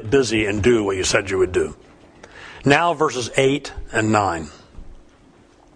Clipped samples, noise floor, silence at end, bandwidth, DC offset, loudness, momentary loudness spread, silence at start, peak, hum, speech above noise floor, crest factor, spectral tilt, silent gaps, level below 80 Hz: under 0.1%; -51 dBFS; 0.8 s; 10.5 kHz; under 0.1%; -19 LUFS; 11 LU; 0 s; 0 dBFS; none; 32 dB; 20 dB; -4.5 dB/octave; none; -42 dBFS